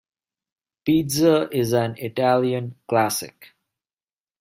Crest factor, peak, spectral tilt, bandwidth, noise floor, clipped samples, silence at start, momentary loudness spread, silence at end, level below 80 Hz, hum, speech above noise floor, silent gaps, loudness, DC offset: 18 dB; -4 dBFS; -5.5 dB/octave; 16 kHz; under -90 dBFS; under 0.1%; 0.85 s; 10 LU; 0.95 s; -60 dBFS; none; over 69 dB; none; -21 LUFS; under 0.1%